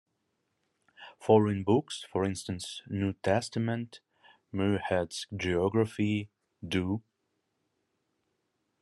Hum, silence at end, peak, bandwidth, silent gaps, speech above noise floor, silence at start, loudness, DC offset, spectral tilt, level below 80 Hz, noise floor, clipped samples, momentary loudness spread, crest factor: none; 1.8 s; -10 dBFS; 12 kHz; none; 50 dB; 1 s; -31 LUFS; under 0.1%; -6 dB/octave; -68 dBFS; -80 dBFS; under 0.1%; 13 LU; 22 dB